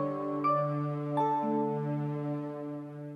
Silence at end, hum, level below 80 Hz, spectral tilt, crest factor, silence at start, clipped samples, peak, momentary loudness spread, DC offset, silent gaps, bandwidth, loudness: 0 s; none; -84 dBFS; -10 dB/octave; 14 dB; 0 s; under 0.1%; -18 dBFS; 10 LU; under 0.1%; none; 6 kHz; -32 LUFS